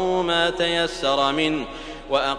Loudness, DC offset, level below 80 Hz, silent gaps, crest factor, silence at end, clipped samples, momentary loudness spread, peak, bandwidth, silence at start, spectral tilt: -21 LUFS; under 0.1%; -44 dBFS; none; 16 dB; 0 s; under 0.1%; 9 LU; -6 dBFS; 10.5 kHz; 0 s; -4 dB/octave